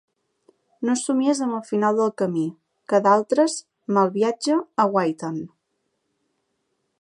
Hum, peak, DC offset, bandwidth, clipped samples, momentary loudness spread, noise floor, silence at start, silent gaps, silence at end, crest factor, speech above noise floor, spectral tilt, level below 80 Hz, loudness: none; -4 dBFS; under 0.1%; 11 kHz; under 0.1%; 12 LU; -74 dBFS; 0.8 s; none; 1.55 s; 20 dB; 53 dB; -5 dB/octave; -78 dBFS; -22 LUFS